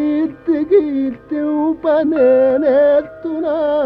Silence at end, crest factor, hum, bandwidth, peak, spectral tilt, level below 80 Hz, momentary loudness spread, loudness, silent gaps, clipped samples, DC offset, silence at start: 0 s; 12 dB; none; 5.2 kHz; -2 dBFS; -8.5 dB/octave; -52 dBFS; 9 LU; -15 LUFS; none; under 0.1%; under 0.1%; 0 s